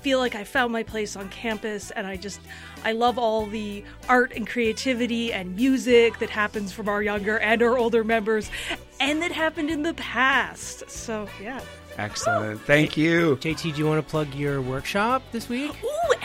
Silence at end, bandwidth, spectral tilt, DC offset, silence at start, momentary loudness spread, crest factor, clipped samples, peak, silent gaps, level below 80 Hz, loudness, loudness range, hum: 0 s; 16 kHz; -4.5 dB/octave; under 0.1%; 0 s; 12 LU; 20 dB; under 0.1%; -6 dBFS; none; -48 dBFS; -24 LUFS; 4 LU; none